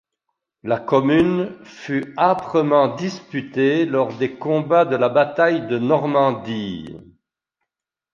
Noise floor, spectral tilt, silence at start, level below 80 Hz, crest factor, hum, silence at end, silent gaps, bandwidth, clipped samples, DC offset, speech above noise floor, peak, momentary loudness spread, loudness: -84 dBFS; -7 dB/octave; 0.65 s; -58 dBFS; 18 dB; none; 1.1 s; none; 7.2 kHz; under 0.1%; under 0.1%; 65 dB; -2 dBFS; 12 LU; -19 LUFS